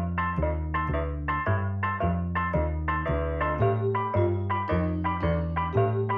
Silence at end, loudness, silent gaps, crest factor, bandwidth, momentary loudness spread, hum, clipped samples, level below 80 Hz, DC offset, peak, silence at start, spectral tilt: 0 s; -27 LUFS; none; 14 dB; 4.9 kHz; 3 LU; none; under 0.1%; -38 dBFS; under 0.1%; -12 dBFS; 0 s; -10.5 dB/octave